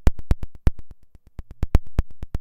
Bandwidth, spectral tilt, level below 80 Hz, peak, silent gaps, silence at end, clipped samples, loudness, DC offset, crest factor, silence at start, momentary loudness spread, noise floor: 8.6 kHz; -7.5 dB/octave; -26 dBFS; -2 dBFS; none; 0 s; under 0.1%; -28 LUFS; under 0.1%; 20 dB; 0 s; 20 LU; -44 dBFS